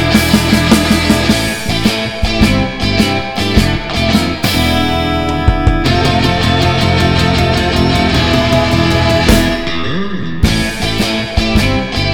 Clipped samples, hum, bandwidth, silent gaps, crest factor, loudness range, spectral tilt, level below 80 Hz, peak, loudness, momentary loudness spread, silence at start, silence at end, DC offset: 0.4%; none; over 20 kHz; none; 12 dB; 2 LU; -5 dB/octave; -20 dBFS; 0 dBFS; -12 LUFS; 5 LU; 0 s; 0 s; under 0.1%